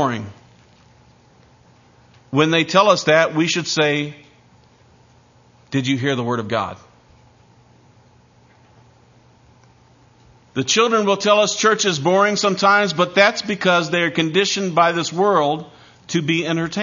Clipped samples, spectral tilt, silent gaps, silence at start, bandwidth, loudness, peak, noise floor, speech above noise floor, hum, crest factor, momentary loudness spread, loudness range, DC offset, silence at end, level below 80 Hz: under 0.1%; -4 dB/octave; none; 0 s; 7.4 kHz; -17 LUFS; 0 dBFS; -52 dBFS; 35 dB; none; 20 dB; 9 LU; 9 LU; under 0.1%; 0 s; -62 dBFS